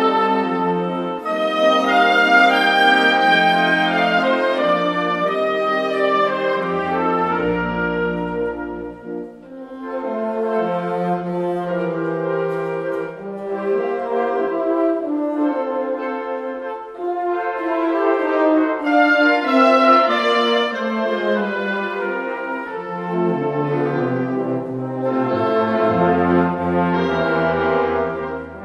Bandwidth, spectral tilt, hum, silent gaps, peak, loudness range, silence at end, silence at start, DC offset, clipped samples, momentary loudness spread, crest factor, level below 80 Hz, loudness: 12.5 kHz; -6 dB/octave; none; none; -2 dBFS; 8 LU; 0 s; 0 s; under 0.1%; under 0.1%; 12 LU; 18 dB; -52 dBFS; -18 LUFS